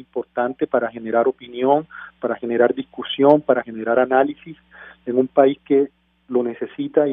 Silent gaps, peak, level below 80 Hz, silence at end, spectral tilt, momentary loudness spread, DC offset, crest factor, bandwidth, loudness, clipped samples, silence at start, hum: none; 0 dBFS; -66 dBFS; 0 s; -9 dB/octave; 11 LU; under 0.1%; 20 dB; 3.8 kHz; -20 LUFS; under 0.1%; 0.15 s; none